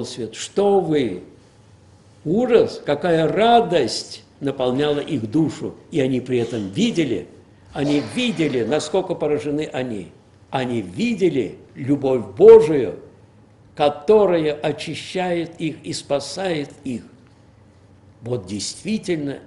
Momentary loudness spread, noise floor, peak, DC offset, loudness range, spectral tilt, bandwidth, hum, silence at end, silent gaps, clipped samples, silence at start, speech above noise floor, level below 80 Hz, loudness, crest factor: 14 LU; -50 dBFS; 0 dBFS; under 0.1%; 10 LU; -5.5 dB/octave; 11.5 kHz; none; 0.05 s; none; under 0.1%; 0 s; 31 dB; -54 dBFS; -20 LUFS; 20 dB